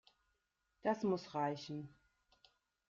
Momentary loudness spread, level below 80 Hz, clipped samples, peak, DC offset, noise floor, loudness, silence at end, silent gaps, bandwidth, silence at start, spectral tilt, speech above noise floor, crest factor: 11 LU; -80 dBFS; under 0.1%; -22 dBFS; under 0.1%; -84 dBFS; -41 LUFS; 1 s; none; 7.6 kHz; 0.85 s; -5.5 dB/octave; 45 dB; 22 dB